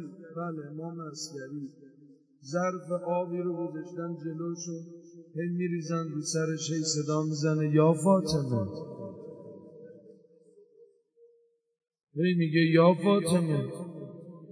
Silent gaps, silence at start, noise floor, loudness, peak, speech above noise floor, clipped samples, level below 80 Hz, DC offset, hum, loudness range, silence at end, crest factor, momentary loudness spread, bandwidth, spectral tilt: none; 0 s; -67 dBFS; -29 LUFS; -10 dBFS; 39 dB; under 0.1%; -68 dBFS; under 0.1%; none; 10 LU; 0 s; 20 dB; 21 LU; 11 kHz; -6 dB/octave